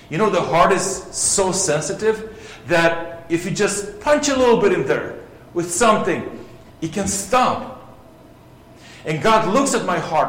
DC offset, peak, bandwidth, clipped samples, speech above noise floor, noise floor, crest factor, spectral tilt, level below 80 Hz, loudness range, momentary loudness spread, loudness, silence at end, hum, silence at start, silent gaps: under 0.1%; -2 dBFS; 16.5 kHz; under 0.1%; 27 dB; -45 dBFS; 18 dB; -3.5 dB/octave; -46 dBFS; 3 LU; 14 LU; -18 LUFS; 0 s; none; 0.1 s; none